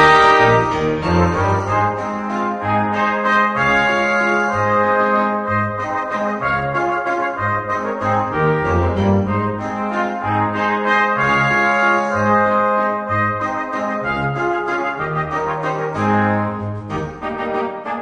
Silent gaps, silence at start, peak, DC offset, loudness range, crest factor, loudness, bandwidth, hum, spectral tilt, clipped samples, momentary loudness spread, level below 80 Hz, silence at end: none; 0 s; 0 dBFS; under 0.1%; 4 LU; 16 dB; -17 LUFS; 10 kHz; none; -6.5 dB/octave; under 0.1%; 7 LU; -42 dBFS; 0 s